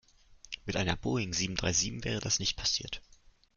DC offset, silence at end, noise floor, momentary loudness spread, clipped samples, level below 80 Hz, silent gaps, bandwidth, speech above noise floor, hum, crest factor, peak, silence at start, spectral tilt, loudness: under 0.1%; 0.55 s; -58 dBFS; 13 LU; under 0.1%; -50 dBFS; none; 11 kHz; 25 dB; none; 22 dB; -12 dBFS; 0.3 s; -3 dB/octave; -31 LUFS